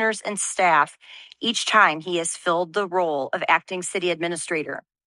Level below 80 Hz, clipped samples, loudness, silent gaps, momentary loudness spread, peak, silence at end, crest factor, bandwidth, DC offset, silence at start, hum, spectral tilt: -76 dBFS; under 0.1%; -22 LUFS; none; 9 LU; -2 dBFS; 0.25 s; 20 dB; 11.5 kHz; under 0.1%; 0 s; none; -2 dB/octave